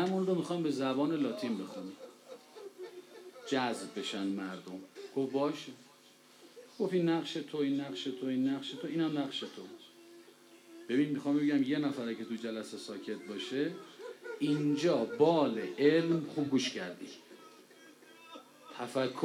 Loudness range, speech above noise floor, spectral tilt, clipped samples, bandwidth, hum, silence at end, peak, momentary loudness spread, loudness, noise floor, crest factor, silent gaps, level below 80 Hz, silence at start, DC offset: 7 LU; 27 dB; -5.5 dB/octave; under 0.1%; 15 kHz; none; 0 s; -14 dBFS; 22 LU; -34 LUFS; -61 dBFS; 20 dB; none; under -90 dBFS; 0 s; under 0.1%